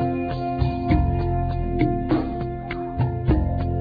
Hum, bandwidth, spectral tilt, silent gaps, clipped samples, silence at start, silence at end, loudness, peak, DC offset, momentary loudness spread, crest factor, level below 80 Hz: none; 5 kHz; -11 dB/octave; none; under 0.1%; 0 s; 0 s; -24 LUFS; -6 dBFS; under 0.1%; 7 LU; 16 dB; -30 dBFS